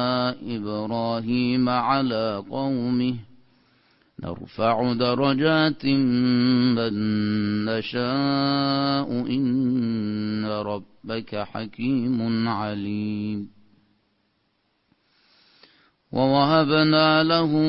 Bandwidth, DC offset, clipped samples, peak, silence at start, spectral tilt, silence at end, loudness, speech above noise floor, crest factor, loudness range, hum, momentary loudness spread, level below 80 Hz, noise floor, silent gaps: 5.8 kHz; under 0.1%; under 0.1%; -6 dBFS; 0 s; -11 dB/octave; 0 s; -23 LUFS; 47 dB; 18 dB; 7 LU; none; 12 LU; -58 dBFS; -70 dBFS; none